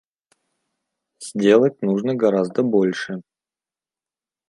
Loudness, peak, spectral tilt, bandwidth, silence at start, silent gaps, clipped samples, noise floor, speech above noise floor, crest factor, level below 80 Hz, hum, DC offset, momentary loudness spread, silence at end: -19 LUFS; -2 dBFS; -6.5 dB/octave; 11.5 kHz; 1.2 s; none; under 0.1%; under -90 dBFS; over 72 dB; 20 dB; -72 dBFS; none; under 0.1%; 15 LU; 1.3 s